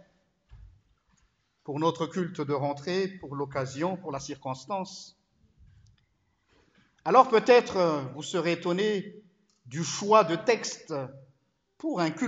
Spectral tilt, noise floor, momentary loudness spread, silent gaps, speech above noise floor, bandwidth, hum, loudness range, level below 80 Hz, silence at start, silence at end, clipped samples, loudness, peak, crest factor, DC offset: -5 dB/octave; -72 dBFS; 16 LU; none; 45 dB; 8.2 kHz; none; 11 LU; -66 dBFS; 0.5 s; 0 s; under 0.1%; -27 LUFS; -6 dBFS; 24 dB; under 0.1%